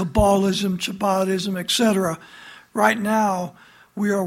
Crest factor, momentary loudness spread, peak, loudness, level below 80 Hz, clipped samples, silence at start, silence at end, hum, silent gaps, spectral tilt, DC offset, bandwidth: 18 dB; 14 LU; -2 dBFS; -21 LUFS; -40 dBFS; under 0.1%; 0 s; 0 s; none; none; -4.5 dB/octave; under 0.1%; 16.5 kHz